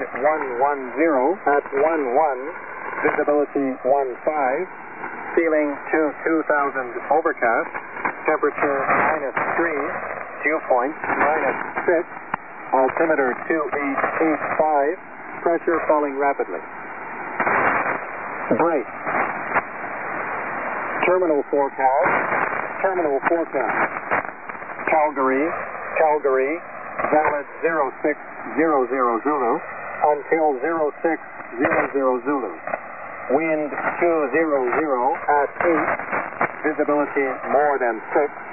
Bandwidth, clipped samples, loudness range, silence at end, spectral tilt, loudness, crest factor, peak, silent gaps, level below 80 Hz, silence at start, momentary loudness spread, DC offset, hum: 3.5 kHz; under 0.1%; 2 LU; 0 s; -10.5 dB/octave; -21 LUFS; 16 dB; -4 dBFS; none; -62 dBFS; 0 s; 10 LU; 0.5%; none